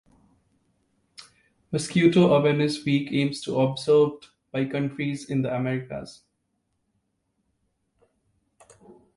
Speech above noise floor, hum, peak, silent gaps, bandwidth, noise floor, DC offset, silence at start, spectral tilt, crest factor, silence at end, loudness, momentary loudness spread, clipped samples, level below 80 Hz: 52 dB; none; -6 dBFS; none; 11.5 kHz; -75 dBFS; under 0.1%; 1.2 s; -6.5 dB/octave; 20 dB; 3.05 s; -24 LUFS; 14 LU; under 0.1%; -62 dBFS